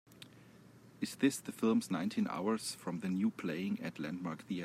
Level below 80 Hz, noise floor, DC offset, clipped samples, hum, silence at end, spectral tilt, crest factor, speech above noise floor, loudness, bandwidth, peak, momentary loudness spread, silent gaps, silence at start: -82 dBFS; -59 dBFS; under 0.1%; under 0.1%; none; 0 s; -5 dB/octave; 18 dB; 23 dB; -37 LUFS; 15.5 kHz; -18 dBFS; 10 LU; none; 0.1 s